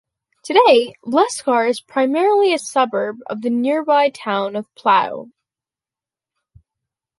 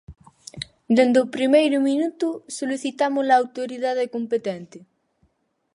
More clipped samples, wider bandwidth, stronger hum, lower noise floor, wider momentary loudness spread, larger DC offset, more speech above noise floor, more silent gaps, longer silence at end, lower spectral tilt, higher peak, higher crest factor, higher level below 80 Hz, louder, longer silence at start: neither; about the same, 11.5 kHz vs 11.5 kHz; neither; first, -90 dBFS vs -69 dBFS; second, 10 LU vs 17 LU; neither; first, 73 dB vs 48 dB; neither; first, 1.95 s vs 0.95 s; about the same, -3.5 dB/octave vs -4.5 dB/octave; about the same, -2 dBFS vs -4 dBFS; about the same, 18 dB vs 18 dB; second, -68 dBFS vs -60 dBFS; first, -17 LUFS vs -21 LUFS; first, 0.45 s vs 0.1 s